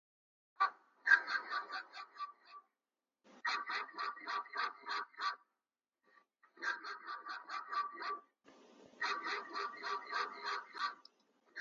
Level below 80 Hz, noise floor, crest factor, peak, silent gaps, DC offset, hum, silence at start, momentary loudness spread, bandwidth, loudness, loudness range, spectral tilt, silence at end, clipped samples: under -90 dBFS; under -90 dBFS; 28 dB; -14 dBFS; none; under 0.1%; none; 0.6 s; 11 LU; 7.4 kHz; -40 LUFS; 7 LU; 4 dB/octave; 0 s; under 0.1%